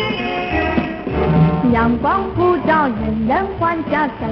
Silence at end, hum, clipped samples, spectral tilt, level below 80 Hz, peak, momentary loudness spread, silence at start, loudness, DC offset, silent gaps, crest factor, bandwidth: 0 s; none; under 0.1%; -9.5 dB/octave; -32 dBFS; -2 dBFS; 6 LU; 0 s; -17 LUFS; under 0.1%; none; 14 dB; 5.8 kHz